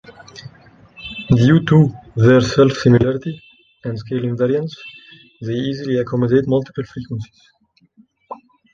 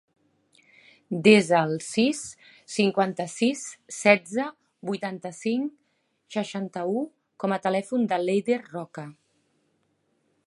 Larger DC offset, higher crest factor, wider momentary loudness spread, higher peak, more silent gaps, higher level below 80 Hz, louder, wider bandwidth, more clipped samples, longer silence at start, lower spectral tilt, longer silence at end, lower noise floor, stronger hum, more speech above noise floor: neither; second, 16 dB vs 24 dB; first, 25 LU vs 16 LU; about the same, 0 dBFS vs -2 dBFS; neither; first, -46 dBFS vs -72 dBFS; first, -16 LUFS vs -25 LUFS; second, 7.4 kHz vs 11.5 kHz; neither; second, 0.35 s vs 1.1 s; first, -7.5 dB/octave vs -5 dB/octave; second, 0.4 s vs 1.35 s; second, -54 dBFS vs -71 dBFS; neither; second, 38 dB vs 47 dB